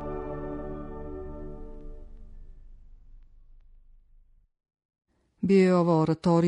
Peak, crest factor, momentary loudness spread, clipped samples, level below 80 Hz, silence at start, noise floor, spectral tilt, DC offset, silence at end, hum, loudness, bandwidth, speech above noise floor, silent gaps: -10 dBFS; 18 dB; 24 LU; under 0.1%; -44 dBFS; 0 s; -58 dBFS; -8.5 dB/octave; under 0.1%; 0 s; none; -26 LUFS; 9.4 kHz; 37 dB; 4.85-4.89 s